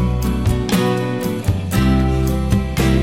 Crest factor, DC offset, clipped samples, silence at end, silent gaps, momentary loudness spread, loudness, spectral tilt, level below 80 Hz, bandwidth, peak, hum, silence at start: 12 dB; 0.7%; under 0.1%; 0 s; none; 4 LU; -18 LUFS; -6.5 dB/octave; -22 dBFS; 16.5 kHz; -4 dBFS; none; 0 s